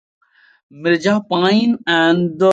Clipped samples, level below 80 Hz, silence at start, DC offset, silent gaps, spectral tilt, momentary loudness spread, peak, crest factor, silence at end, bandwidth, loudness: under 0.1%; -62 dBFS; 0.75 s; under 0.1%; none; -6 dB/octave; 3 LU; -2 dBFS; 14 dB; 0 s; 8.8 kHz; -16 LUFS